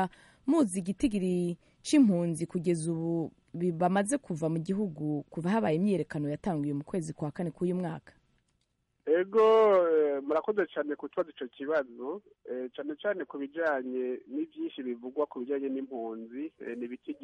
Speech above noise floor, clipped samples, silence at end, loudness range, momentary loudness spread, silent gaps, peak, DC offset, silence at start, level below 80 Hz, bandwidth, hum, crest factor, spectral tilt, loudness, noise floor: 47 dB; under 0.1%; 0.1 s; 7 LU; 15 LU; none; -14 dBFS; under 0.1%; 0 s; -64 dBFS; 11.5 kHz; none; 16 dB; -6.5 dB/octave; -31 LUFS; -77 dBFS